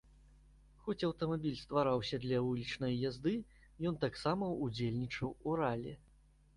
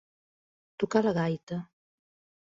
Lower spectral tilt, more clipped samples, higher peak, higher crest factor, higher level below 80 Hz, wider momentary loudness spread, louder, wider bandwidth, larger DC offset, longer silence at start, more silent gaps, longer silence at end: about the same, -7 dB/octave vs -7 dB/octave; neither; second, -20 dBFS vs -10 dBFS; about the same, 18 dB vs 22 dB; first, -62 dBFS vs -68 dBFS; second, 8 LU vs 12 LU; second, -38 LUFS vs -30 LUFS; first, 11.5 kHz vs 7.6 kHz; neither; about the same, 0.85 s vs 0.8 s; second, none vs 1.43-1.47 s; second, 0.6 s vs 0.8 s